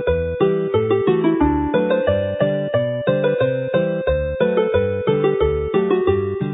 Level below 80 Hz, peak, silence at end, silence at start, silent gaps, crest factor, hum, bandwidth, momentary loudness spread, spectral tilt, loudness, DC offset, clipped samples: -34 dBFS; -4 dBFS; 0 s; 0 s; none; 14 dB; none; 4 kHz; 3 LU; -12.5 dB/octave; -19 LUFS; under 0.1%; under 0.1%